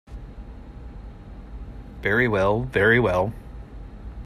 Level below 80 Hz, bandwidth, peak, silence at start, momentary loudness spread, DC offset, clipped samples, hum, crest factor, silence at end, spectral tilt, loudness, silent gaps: -40 dBFS; 14 kHz; -6 dBFS; 0.1 s; 24 LU; under 0.1%; under 0.1%; none; 18 dB; 0 s; -7 dB/octave; -21 LUFS; none